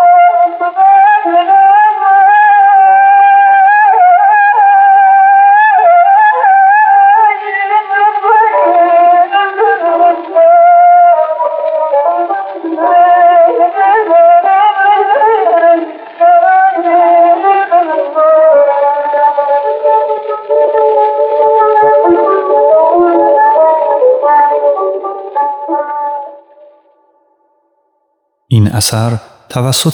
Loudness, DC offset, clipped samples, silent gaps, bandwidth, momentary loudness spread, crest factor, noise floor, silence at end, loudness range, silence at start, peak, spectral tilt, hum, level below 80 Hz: -7 LUFS; under 0.1%; under 0.1%; none; 16 kHz; 9 LU; 8 dB; -62 dBFS; 0 s; 9 LU; 0 s; 0 dBFS; -5 dB/octave; none; -56 dBFS